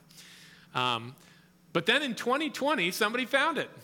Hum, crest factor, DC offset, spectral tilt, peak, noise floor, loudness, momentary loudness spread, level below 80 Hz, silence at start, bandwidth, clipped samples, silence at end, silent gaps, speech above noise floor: none; 20 dB; under 0.1%; -3.5 dB/octave; -10 dBFS; -53 dBFS; -28 LUFS; 9 LU; -78 dBFS; 0.15 s; 18 kHz; under 0.1%; 0 s; none; 24 dB